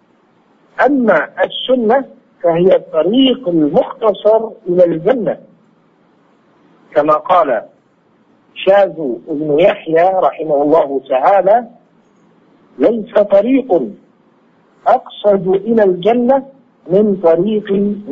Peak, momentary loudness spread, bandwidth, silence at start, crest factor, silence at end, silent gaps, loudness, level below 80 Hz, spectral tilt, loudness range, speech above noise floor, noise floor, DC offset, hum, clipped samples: 0 dBFS; 6 LU; 6 kHz; 0.8 s; 14 dB; 0 s; none; -13 LUFS; -58 dBFS; -8 dB/octave; 3 LU; 41 dB; -53 dBFS; under 0.1%; none; under 0.1%